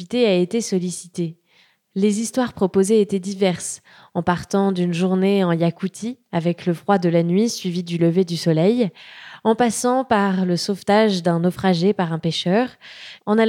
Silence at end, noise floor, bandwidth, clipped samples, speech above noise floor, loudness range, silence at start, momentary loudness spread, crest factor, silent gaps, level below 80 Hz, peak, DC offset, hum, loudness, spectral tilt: 0 s; -58 dBFS; 15 kHz; under 0.1%; 39 dB; 2 LU; 0 s; 10 LU; 16 dB; none; -60 dBFS; -4 dBFS; under 0.1%; none; -20 LUFS; -5.5 dB/octave